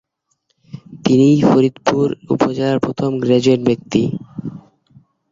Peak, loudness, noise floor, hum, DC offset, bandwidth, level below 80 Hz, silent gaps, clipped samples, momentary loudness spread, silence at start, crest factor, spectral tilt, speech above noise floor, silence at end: -2 dBFS; -15 LUFS; -67 dBFS; none; under 0.1%; 7.6 kHz; -52 dBFS; none; under 0.1%; 16 LU; 0.75 s; 16 dB; -7 dB/octave; 53 dB; 0.7 s